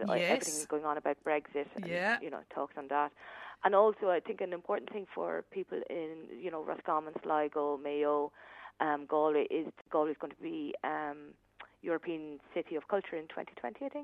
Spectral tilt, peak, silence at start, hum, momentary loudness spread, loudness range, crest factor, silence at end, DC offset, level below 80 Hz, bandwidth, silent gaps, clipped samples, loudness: -4 dB/octave; -14 dBFS; 0 s; none; 12 LU; 5 LU; 22 dB; 0 s; under 0.1%; -80 dBFS; 13 kHz; none; under 0.1%; -35 LUFS